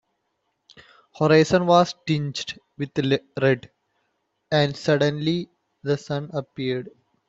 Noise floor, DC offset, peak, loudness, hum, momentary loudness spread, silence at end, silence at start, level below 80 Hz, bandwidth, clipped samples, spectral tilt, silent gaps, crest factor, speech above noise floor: -75 dBFS; under 0.1%; -4 dBFS; -23 LUFS; none; 14 LU; 0.4 s; 1.15 s; -60 dBFS; 7.8 kHz; under 0.1%; -6 dB/octave; none; 20 dB; 53 dB